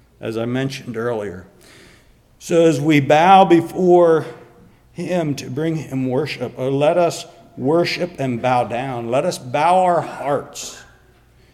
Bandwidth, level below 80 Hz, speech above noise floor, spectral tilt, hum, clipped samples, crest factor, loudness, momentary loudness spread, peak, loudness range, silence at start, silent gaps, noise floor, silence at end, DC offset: 14.5 kHz; -56 dBFS; 34 dB; -6 dB/octave; none; under 0.1%; 18 dB; -17 LUFS; 18 LU; 0 dBFS; 5 LU; 0.2 s; none; -51 dBFS; 0.7 s; under 0.1%